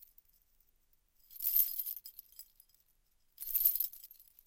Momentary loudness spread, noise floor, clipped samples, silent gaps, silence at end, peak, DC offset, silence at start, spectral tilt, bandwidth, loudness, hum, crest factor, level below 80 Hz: 25 LU; -73 dBFS; under 0.1%; none; 0.25 s; -14 dBFS; under 0.1%; 1.3 s; 2.5 dB/octave; 17 kHz; -32 LUFS; none; 26 dB; -72 dBFS